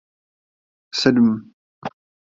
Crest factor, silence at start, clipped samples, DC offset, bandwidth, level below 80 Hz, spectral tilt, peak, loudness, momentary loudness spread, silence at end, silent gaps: 20 dB; 0.95 s; under 0.1%; under 0.1%; 7.6 kHz; -58 dBFS; -5.5 dB/octave; -2 dBFS; -19 LUFS; 19 LU; 0.45 s; 1.53-1.82 s